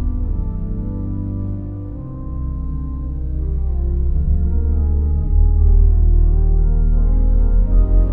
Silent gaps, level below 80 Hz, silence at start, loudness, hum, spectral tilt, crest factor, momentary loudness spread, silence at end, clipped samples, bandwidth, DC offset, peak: none; -16 dBFS; 0 s; -20 LUFS; none; -14 dB/octave; 12 dB; 10 LU; 0 s; under 0.1%; 1.5 kHz; under 0.1%; -4 dBFS